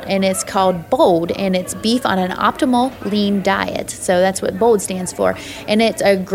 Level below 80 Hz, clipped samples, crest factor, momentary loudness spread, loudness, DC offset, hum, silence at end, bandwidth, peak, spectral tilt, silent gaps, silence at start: -48 dBFS; under 0.1%; 16 dB; 5 LU; -17 LUFS; under 0.1%; none; 0 s; 16.5 kHz; -2 dBFS; -4.5 dB/octave; none; 0 s